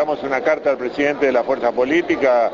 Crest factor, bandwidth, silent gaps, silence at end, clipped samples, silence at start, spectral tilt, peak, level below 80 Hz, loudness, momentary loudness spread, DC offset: 14 dB; 7.2 kHz; none; 0 s; under 0.1%; 0 s; -5.5 dB/octave; -4 dBFS; -54 dBFS; -18 LUFS; 3 LU; under 0.1%